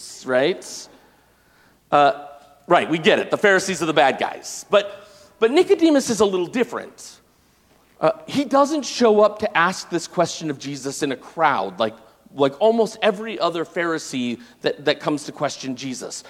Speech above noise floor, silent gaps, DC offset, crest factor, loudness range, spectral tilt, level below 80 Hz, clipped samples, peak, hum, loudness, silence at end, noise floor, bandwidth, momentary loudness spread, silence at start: 38 dB; none; under 0.1%; 20 dB; 4 LU; -4 dB/octave; -64 dBFS; under 0.1%; 0 dBFS; none; -20 LUFS; 0 s; -58 dBFS; 15.5 kHz; 12 LU; 0 s